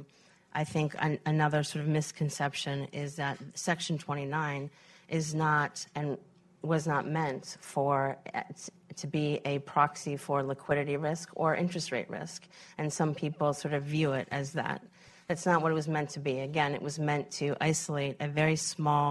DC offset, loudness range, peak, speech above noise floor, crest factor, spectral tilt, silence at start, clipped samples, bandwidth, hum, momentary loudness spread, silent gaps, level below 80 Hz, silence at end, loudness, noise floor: under 0.1%; 2 LU; -12 dBFS; 30 dB; 20 dB; -5 dB/octave; 0 s; under 0.1%; 12.5 kHz; none; 10 LU; none; -68 dBFS; 0 s; -32 LUFS; -62 dBFS